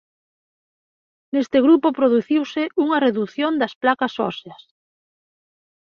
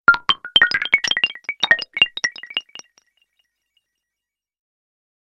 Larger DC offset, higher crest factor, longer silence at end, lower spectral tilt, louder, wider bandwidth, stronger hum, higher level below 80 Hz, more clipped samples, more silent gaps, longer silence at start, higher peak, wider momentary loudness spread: neither; about the same, 18 dB vs 22 dB; second, 1.3 s vs 2.7 s; first, -6 dB/octave vs 0 dB/octave; about the same, -19 LUFS vs -17 LUFS; second, 6.8 kHz vs 10 kHz; neither; second, -68 dBFS vs -58 dBFS; neither; first, 3.75-3.81 s vs none; first, 1.35 s vs 0.1 s; second, -4 dBFS vs 0 dBFS; about the same, 10 LU vs 11 LU